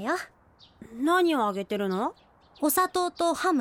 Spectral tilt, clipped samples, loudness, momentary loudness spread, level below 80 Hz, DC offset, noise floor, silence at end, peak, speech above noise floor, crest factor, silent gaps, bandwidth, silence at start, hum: -4 dB/octave; under 0.1%; -27 LUFS; 10 LU; -66 dBFS; under 0.1%; -52 dBFS; 0 s; -10 dBFS; 25 dB; 16 dB; none; 17.5 kHz; 0 s; none